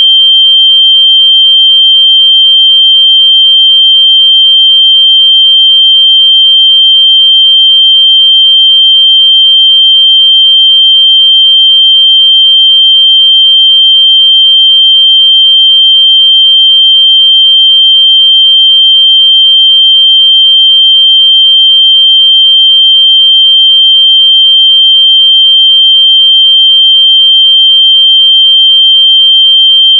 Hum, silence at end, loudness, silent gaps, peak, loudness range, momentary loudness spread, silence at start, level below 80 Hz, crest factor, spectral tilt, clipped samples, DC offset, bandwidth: none; 0 s; 0 LUFS; none; 0 dBFS; 0 LU; 0 LU; 0 s; under -90 dBFS; 4 dB; 17.5 dB/octave; 0.4%; under 0.1%; 3.4 kHz